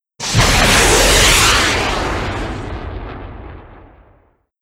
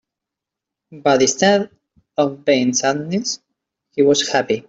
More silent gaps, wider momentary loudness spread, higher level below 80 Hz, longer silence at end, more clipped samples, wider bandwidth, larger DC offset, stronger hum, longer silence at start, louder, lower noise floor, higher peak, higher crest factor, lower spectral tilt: neither; first, 20 LU vs 13 LU; first, -24 dBFS vs -62 dBFS; first, 0.85 s vs 0.05 s; neither; first, 16.5 kHz vs 8 kHz; neither; neither; second, 0.2 s vs 0.9 s; first, -12 LUFS vs -17 LUFS; second, -54 dBFS vs -84 dBFS; about the same, 0 dBFS vs -2 dBFS; about the same, 16 dB vs 16 dB; about the same, -2.5 dB/octave vs -3.5 dB/octave